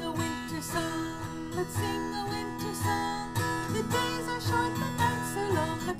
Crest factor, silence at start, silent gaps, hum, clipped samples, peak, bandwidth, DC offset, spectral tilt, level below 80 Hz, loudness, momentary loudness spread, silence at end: 18 dB; 0 s; none; none; under 0.1%; -14 dBFS; 15.5 kHz; under 0.1%; -4.5 dB/octave; -52 dBFS; -31 LUFS; 6 LU; 0 s